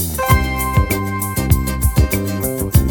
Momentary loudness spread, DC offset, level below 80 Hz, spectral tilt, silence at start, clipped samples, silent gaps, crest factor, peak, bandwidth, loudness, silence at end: 5 LU; under 0.1%; -22 dBFS; -5.5 dB/octave; 0 s; under 0.1%; none; 16 dB; 0 dBFS; 19.5 kHz; -17 LUFS; 0 s